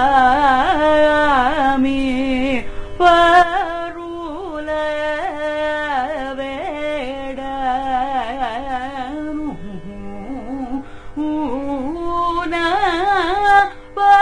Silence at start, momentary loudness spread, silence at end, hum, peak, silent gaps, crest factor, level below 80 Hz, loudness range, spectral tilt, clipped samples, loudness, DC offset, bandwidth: 0 s; 15 LU; 0 s; none; 0 dBFS; none; 16 dB; -36 dBFS; 10 LU; -5 dB/octave; under 0.1%; -18 LUFS; under 0.1%; 10.5 kHz